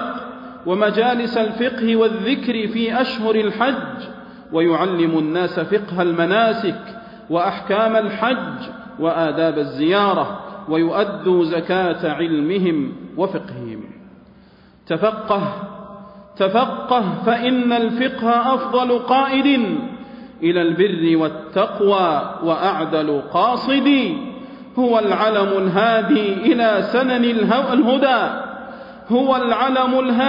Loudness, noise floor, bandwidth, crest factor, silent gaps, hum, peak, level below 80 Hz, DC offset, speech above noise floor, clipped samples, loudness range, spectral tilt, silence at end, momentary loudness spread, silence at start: -18 LUFS; -48 dBFS; 5.4 kHz; 14 dB; none; none; -4 dBFS; -58 dBFS; under 0.1%; 31 dB; under 0.1%; 5 LU; -8.5 dB/octave; 0 s; 14 LU; 0 s